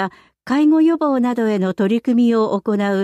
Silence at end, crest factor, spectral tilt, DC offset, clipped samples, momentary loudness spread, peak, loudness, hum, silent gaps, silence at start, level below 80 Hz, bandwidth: 0 s; 10 dB; -7.5 dB/octave; under 0.1%; under 0.1%; 5 LU; -8 dBFS; -17 LUFS; none; none; 0 s; -66 dBFS; 8.6 kHz